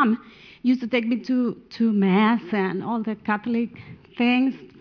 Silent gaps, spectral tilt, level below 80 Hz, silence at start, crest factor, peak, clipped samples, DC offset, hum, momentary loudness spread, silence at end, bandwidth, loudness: none; -8 dB/octave; -66 dBFS; 0 s; 16 dB; -8 dBFS; under 0.1%; under 0.1%; none; 8 LU; 0.15 s; 5.4 kHz; -23 LUFS